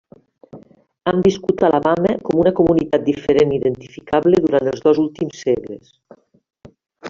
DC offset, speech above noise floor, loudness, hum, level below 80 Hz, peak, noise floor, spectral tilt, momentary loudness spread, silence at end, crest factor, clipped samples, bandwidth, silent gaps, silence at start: under 0.1%; 29 dB; -17 LUFS; none; -48 dBFS; -2 dBFS; -46 dBFS; -6.5 dB/octave; 8 LU; 0 s; 16 dB; under 0.1%; 7.4 kHz; none; 0.55 s